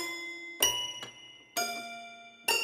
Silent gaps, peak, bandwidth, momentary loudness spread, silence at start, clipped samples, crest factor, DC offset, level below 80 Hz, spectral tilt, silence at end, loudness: none; -10 dBFS; 16 kHz; 17 LU; 0 s; under 0.1%; 26 dB; under 0.1%; -68 dBFS; 0.5 dB/octave; 0 s; -32 LUFS